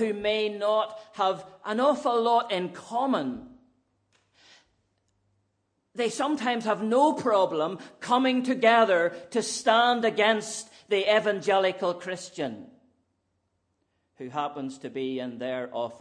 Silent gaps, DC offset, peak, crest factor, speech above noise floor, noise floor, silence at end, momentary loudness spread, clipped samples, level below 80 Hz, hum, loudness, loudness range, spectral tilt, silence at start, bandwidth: none; under 0.1%; -8 dBFS; 20 dB; 50 dB; -76 dBFS; 0 s; 13 LU; under 0.1%; -72 dBFS; none; -26 LUFS; 12 LU; -3.5 dB/octave; 0 s; 10.5 kHz